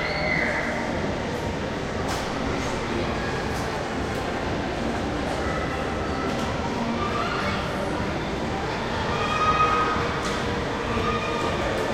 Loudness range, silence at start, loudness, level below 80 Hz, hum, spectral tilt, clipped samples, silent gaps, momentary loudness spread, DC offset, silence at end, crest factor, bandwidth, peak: 3 LU; 0 s; -26 LUFS; -38 dBFS; none; -5 dB/octave; under 0.1%; none; 5 LU; under 0.1%; 0 s; 16 dB; 16 kHz; -8 dBFS